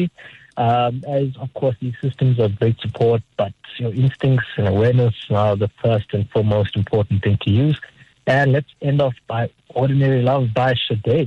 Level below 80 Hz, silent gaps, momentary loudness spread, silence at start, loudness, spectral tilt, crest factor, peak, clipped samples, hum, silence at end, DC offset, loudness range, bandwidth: -50 dBFS; none; 9 LU; 0 s; -19 LUFS; -9 dB/octave; 10 dB; -8 dBFS; under 0.1%; none; 0 s; under 0.1%; 2 LU; 5.6 kHz